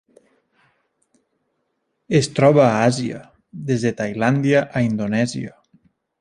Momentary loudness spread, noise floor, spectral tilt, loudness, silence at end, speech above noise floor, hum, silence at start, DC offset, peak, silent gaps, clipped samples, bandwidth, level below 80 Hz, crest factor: 17 LU; -72 dBFS; -6.5 dB/octave; -19 LUFS; 0.7 s; 54 dB; none; 2.1 s; under 0.1%; -2 dBFS; none; under 0.1%; 10.5 kHz; -56 dBFS; 18 dB